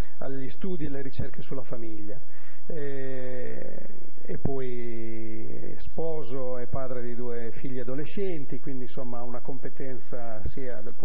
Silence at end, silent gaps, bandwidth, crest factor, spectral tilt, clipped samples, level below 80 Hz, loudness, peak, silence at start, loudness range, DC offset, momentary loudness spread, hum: 0 s; none; 5.6 kHz; 26 dB; -8 dB/octave; under 0.1%; -50 dBFS; -37 LUFS; -6 dBFS; 0 s; 3 LU; 20%; 8 LU; none